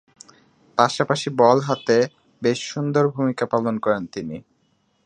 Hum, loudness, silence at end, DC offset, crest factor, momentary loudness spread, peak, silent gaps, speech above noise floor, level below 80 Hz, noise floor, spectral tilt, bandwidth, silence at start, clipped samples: none; -21 LUFS; 0.65 s; under 0.1%; 20 dB; 11 LU; 0 dBFS; none; 45 dB; -64 dBFS; -65 dBFS; -5.5 dB/octave; 10.5 kHz; 0.75 s; under 0.1%